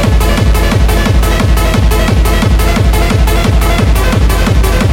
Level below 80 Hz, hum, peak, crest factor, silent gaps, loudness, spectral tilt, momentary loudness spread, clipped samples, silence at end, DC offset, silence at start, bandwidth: -10 dBFS; none; 0 dBFS; 8 dB; none; -10 LUFS; -5.5 dB/octave; 0 LU; under 0.1%; 0 s; under 0.1%; 0 s; 16.5 kHz